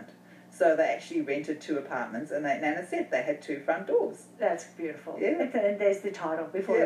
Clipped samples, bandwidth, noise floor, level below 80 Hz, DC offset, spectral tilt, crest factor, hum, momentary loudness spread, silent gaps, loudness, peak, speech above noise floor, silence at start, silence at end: under 0.1%; 12.5 kHz; -52 dBFS; under -90 dBFS; under 0.1%; -5.5 dB/octave; 18 dB; none; 8 LU; none; -30 LUFS; -12 dBFS; 23 dB; 0 s; 0 s